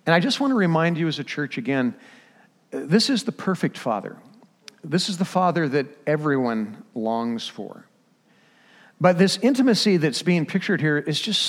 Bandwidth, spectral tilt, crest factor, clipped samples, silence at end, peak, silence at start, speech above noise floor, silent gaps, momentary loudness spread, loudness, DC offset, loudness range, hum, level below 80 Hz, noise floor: 15.5 kHz; -5 dB/octave; 20 dB; under 0.1%; 0 s; -4 dBFS; 0.05 s; 38 dB; none; 11 LU; -22 LUFS; under 0.1%; 5 LU; none; -74 dBFS; -60 dBFS